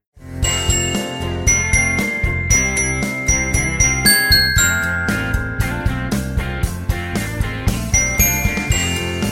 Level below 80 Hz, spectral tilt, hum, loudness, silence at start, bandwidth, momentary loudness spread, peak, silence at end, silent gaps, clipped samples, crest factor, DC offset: -26 dBFS; -2.5 dB/octave; none; -16 LUFS; 0.15 s; 16.5 kHz; 10 LU; 0 dBFS; 0 s; none; under 0.1%; 18 dB; under 0.1%